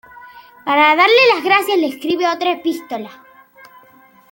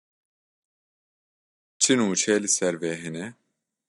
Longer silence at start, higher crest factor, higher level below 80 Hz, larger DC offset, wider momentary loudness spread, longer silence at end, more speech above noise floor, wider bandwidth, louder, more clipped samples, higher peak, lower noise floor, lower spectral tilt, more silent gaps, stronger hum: second, 0.25 s vs 1.8 s; second, 16 dB vs 22 dB; first, -68 dBFS vs -76 dBFS; neither; first, 18 LU vs 15 LU; first, 1.2 s vs 0.6 s; second, 33 dB vs over 66 dB; first, 17 kHz vs 11.5 kHz; first, -14 LUFS vs -23 LUFS; neither; first, 0 dBFS vs -6 dBFS; second, -48 dBFS vs under -90 dBFS; about the same, -3 dB/octave vs -2.5 dB/octave; neither; neither